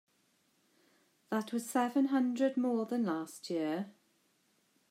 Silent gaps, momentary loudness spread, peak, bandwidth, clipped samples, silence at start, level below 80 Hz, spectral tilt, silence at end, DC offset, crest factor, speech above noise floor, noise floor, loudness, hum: none; 9 LU; -20 dBFS; 16 kHz; under 0.1%; 1.3 s; under -90 dBFS; -5.5 dB/octave; 1 s; under 0.1%; 16 dB; 41 dB; -74 dBFS; -34 LUFS; none